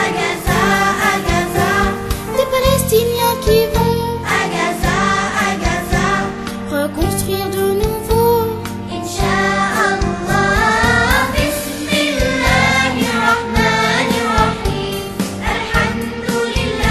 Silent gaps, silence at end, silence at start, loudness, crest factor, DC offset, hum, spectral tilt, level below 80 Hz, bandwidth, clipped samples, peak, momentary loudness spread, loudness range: none; 0 s; 0 s; -15 LUFS; 14 dB; under 0.1%; none; -4.5 dB/octave; -28 dBFS; 13.5 kHz; under 0.1%; 0 dBFS; 7 LU; 3 LU